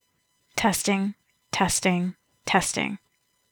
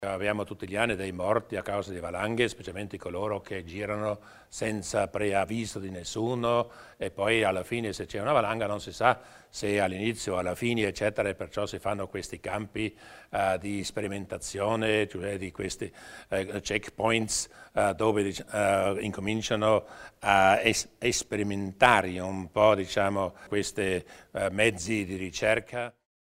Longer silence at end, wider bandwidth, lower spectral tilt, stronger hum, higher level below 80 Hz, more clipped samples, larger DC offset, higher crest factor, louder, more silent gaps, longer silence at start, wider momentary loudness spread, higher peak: first, 0.55 s vs 0.35 s; first, over 20 kHz vs 16 kHz; about the same, -3.5 dB/octave vs -4 dB/octave; neither; about the same, -54 dBFS vs -56 dBFS; neither; neither; about the same, 22 dB vs 26 dB; first, -25 LUFS vs -29 LUFS; neither; first, 0.55 s vs 0 s; about the same, 11 LU vs 11 LU; about the same, -6 dBFS vs -4 dBFS